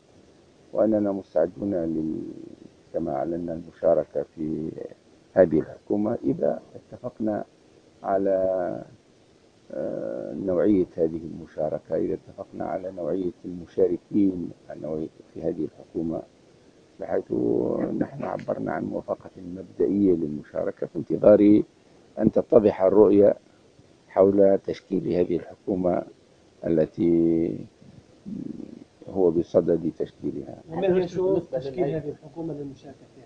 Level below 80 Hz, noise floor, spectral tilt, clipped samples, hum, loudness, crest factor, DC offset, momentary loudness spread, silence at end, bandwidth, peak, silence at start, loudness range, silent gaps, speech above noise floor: -56 dBFS; -57 dBFS; -9.5 dB/octave; under 0.1%; none; -25 LUFS; 22 dB; under 0.1%; 18 LU; 0.05 s; 7 kHz; -4 dBFS; 0.75 s; 8 LU; none; 33 dB